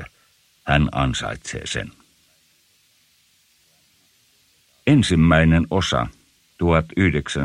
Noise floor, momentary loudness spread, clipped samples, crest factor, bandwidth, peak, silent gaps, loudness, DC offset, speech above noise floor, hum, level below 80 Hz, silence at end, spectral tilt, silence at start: -60 dBFS; 14 LU; under 0.1%; 18 dB; 11.5 kHz; -4 dBFS; none; -20 LUFS; under 0.1%; 42 dB; none; -36 dBFS; 0 s; -6 dB/octave; 0 s